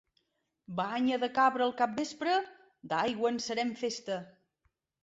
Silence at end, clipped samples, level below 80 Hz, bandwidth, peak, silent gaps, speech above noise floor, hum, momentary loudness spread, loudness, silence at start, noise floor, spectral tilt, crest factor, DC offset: 0.75 s; under 0.1%; -74 dBFS; 8 kHz; -14 dBFS; none; 48 dB; none; 10 LU; -32 LUFS; 0.7 s; -79 dBFS; -4 dB/octave; 18 dB; under 0.1%